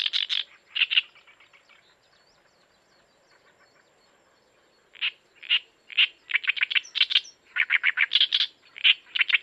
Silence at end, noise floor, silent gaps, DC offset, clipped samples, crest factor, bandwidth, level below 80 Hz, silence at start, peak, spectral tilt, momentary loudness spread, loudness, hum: 0 s; -63 dBFS; none; under 0.1%; under 0.1%; 22 dB; 10 kHz; -84 dBFS; 0 s; -6 dBFS; 3.5 dB/octave; 10 LU; -23 LUFS; none